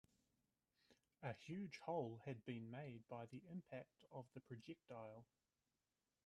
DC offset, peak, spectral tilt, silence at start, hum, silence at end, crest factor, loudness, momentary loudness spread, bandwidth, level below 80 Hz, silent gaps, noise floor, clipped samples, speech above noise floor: under 0.1%; -34 dBFS; -7 dB/octave; 0.9 s; none; 1 s; 22 dB; -54 LUFS; 11 LU; 11 kHz; -88 dBFS; none; under -90 dBFS; under 0.1%; over 37 dB